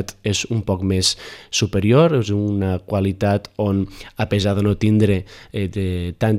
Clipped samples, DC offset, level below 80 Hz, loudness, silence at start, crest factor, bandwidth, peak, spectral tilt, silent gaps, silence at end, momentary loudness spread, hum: under 0.1%; under 0.1%; -44 dBFS; -20 LUFS; 0 s; 16 dB; 14 kHz; -4 dBFS; -5.5 dB/octave; none; 0 s; 8 LU; none